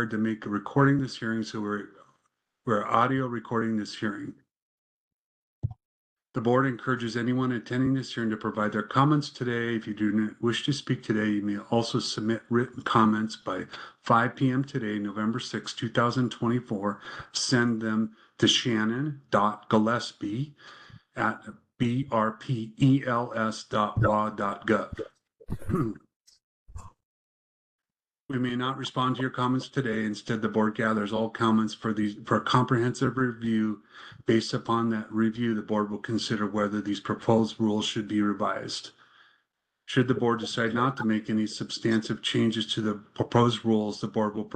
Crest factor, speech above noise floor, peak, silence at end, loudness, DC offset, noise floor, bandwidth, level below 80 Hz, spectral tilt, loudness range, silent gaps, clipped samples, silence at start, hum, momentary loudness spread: 22 dB; 51 dB; -6 dBFS; 0 s; -27 LUFS; under 0.1%; -78 dBFS; 9.2 kHz; -58 dBFS; -5.5 dB/octave; 5 LU; 4.57-5.62 s, 5.85-6.16 s, 26.16-26.24 s, 26.44-26.66 s, 27.05-27.79 s, 28.20-28.27 s; under 0.1%; 0 s; none; 9 LU